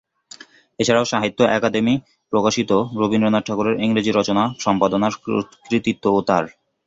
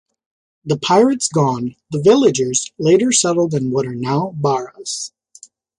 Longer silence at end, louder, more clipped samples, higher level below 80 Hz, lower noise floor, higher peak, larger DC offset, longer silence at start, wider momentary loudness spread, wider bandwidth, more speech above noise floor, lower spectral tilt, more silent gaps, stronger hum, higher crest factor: second, 0.35 s vs 0.7 s; second, -19 LUFS vs -16 LUFS; neither; about the same, -54 dBFS vs -56 dBFS; about the same, -44 dBFS vs -46 dBFS; about the same, -2 dBFS vs -2 dBFS; neither; first, 0.8 s vs 0.65 s; second, 6 LU vs 12 LU; second, 7.8 kHz vs 11.5 kHz; second, 26 dB vs 30 dB; about the same, -5 dB/octave vs -4.5 dB/octave; neither; neither; about the same, 18 dB vs 16 dB